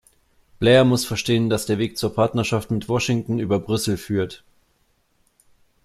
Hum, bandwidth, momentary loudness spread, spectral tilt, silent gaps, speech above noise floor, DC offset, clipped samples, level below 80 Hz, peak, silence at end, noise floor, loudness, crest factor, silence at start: none; 15 kHz; 9 LU; -5.5 dB/octave; none; 45 dB; under 0.1%; under 0.1%; -52 dBFS; -4 dBFS; 1.5 s; -65 dBFS; -21 LUFS; 18 dB; 0.6 s